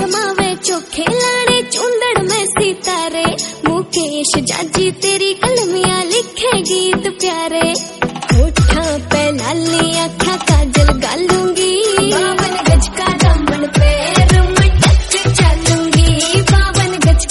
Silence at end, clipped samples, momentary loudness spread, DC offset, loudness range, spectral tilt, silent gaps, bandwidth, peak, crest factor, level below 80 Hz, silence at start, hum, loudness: 0 s; under 0.1%; 5 LU; under 0.1%; 3 LU; -4 dB/octave; none; 12 kHz; 0 dBFS; 12 dB; -18 dBFS; 0 s; none; -13 LUFS